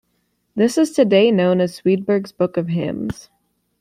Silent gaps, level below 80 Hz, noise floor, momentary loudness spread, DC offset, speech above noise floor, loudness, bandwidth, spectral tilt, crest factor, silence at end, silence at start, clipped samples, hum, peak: none; -54 dBFS; -68 dBFS; 13 LU; under 0.1%; 51 dB; -18 LUFS; 14.5 kHz; -6.5 dB/octave; 16 dB; 0.6 s; 0.55 s; under 0.1%; none; -2 dBFS